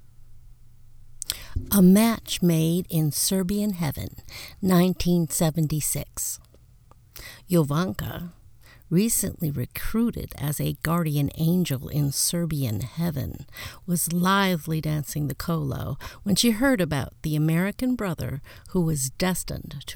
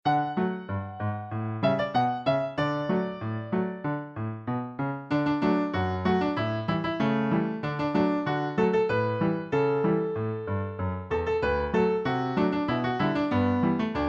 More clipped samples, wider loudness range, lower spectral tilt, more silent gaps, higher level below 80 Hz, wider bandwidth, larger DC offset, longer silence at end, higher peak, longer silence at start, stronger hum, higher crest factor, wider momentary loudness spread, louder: neither; about the same, 4 LU vs 3 LU; second, -5 dB/octave vs -8.5 dB/octave; neither; first, -44 dBFS vs -50 dBFS; first, over 20 kHz vs 7.4 kHz; neither; about the same, 0 s vs 0 s; first, -2 dBFS vs -12 dBFS; first, 0.2 s vs 0.05 s; neither; first, 22 dB vs 16 dB; first, 13 LU vs 8 LU; about the same, -25 LUFS vs -27 LUFS